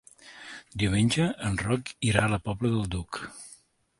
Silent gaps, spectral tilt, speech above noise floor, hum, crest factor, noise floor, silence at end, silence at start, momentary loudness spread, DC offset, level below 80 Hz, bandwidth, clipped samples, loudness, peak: none; -5.5 dB/octave; 30 dB; none; 22 dB; -57 dBFS; 0.45 s; 0.25 s; 20 LU; under 0.1%; -46 dBFS; 11.5 kHz; under 0.1%; -28 LUFS; -6 dBFS